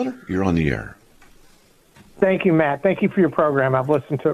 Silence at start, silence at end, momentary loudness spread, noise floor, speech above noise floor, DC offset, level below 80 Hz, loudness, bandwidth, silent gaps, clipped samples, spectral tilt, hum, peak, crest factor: 0 s; 0 s; 6 LU; -53 dBFS; 34 dB; under 0.1%; -44 dBFS; -20 LUFS; 13.5 kHz; none; under 0.1%; -8.5 dB/octave; none; -4 dBFS; 18 dB